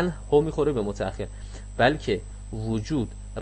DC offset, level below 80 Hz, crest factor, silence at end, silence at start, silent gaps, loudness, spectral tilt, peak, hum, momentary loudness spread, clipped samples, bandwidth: under 0.1%; -38 dBFS; 20 dB; 0 s; 0 s; none; -26 LUFS; -6.5 dB/octave; -6 dBFS; none; 14 LU; under 0.1%; 8.6 kHz